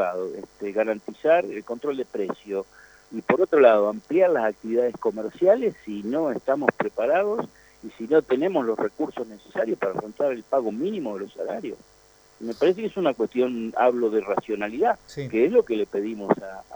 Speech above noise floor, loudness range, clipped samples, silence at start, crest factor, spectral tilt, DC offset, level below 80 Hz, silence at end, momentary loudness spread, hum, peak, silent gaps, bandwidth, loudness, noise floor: 31 dB; 6 LU; under 0.1%; 0 s; 24 dB; -6.5 dB/octave; under 0.1%; -64 dBFS; 0 s; 12 LU; none; 0 dBFS; none; over 20 kHz; -24 LUFS; -54 dBFS